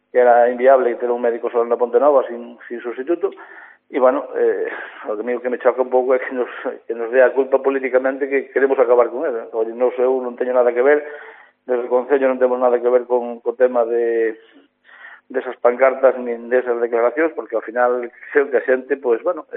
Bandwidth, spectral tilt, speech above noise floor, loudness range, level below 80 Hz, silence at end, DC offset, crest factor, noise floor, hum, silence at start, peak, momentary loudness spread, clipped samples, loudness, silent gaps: 3.7 kHz; -2.5 dB/octave; 25 dB; 3 LU; -80 dBFS; 0 s; under 0.1%; 18 dB; -43 dBFS; none; 0.15 s; 0 dBFS; 12 LU; under 0.1%; -18 LUFS; none